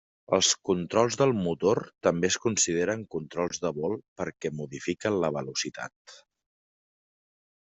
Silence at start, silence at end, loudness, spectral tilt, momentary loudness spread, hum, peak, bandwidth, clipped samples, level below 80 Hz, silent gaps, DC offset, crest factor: 0.3 s; 1.6 s; -28 LUFS; -3.5 dB/octave; 11 LU; none; -8 dBFS; 8.2 kHz; under 0.1%; -66 dBFS; 4.08-4.16 s, 5.96-6.05 s; under 0.1%; 22 dB